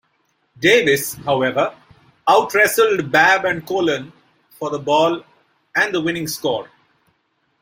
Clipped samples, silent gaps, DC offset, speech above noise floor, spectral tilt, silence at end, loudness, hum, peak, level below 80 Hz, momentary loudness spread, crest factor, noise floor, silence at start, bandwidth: under 0.1%; none; under 0.1%; 49 dB; -3.5 dB/octave; 1 s; -17 LUFS; none; -2 dBFS; -60 dBFS; 11 LU; 18 dB; -66 dBFS; 0.6 s; 16.5 kHz